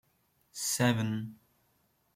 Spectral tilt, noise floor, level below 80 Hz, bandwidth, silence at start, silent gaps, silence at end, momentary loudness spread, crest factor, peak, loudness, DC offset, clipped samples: -4 dB/octave; -73 dBFS; -70 dBFS; 16.5 kHz; 0.55 s; none; 0.8 s; 18 LU; 20 dB; -14 dBFS; -31 LUFS; under 0.1%; under 0.1%